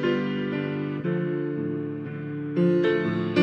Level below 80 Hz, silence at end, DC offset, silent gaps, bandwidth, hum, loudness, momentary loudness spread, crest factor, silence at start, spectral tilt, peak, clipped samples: -66 dBFS; 0 s; under 0.1%; none; 6.2 kHz; none; -27 LUFS; 10 LU; 18 dB; 0 s; -8.5 dB/octave; -6 dBFS; under 0.1%